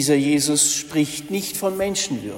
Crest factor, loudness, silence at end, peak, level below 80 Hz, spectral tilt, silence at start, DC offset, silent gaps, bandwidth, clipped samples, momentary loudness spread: 16 dB; -20 LUFS; 0 s; -4 dBFS; -56 dBFS; -3 dB/octave; 0 s; under 0.1%; none; 16.5 kHz; under 0.1%; 8 LU